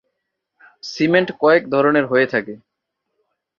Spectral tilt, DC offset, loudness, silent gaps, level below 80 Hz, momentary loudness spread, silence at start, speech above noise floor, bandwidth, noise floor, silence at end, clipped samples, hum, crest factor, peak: -6 dB/octave; under 0.1%; -17 LUFS; none; -64 dBFS; 17 LU; 0.85 s; 61 dB; 7.2 kHz; -77 dBFS; 1.05 s; under 0.1%; none; 18 dB; -2 dBFS